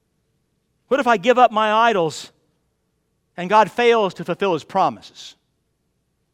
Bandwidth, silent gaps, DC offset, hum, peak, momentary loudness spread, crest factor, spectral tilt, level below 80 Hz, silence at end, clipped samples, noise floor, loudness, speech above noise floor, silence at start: 13 kHz; none; under 0.1%; none; 0 dBFS; 18 LU; 20 dB; -4.5 dB/octave; -66 dBFS; 1.05 s; under 0.1%; -70 dBFS; -18 LUFS; 52 dB; 0.9 s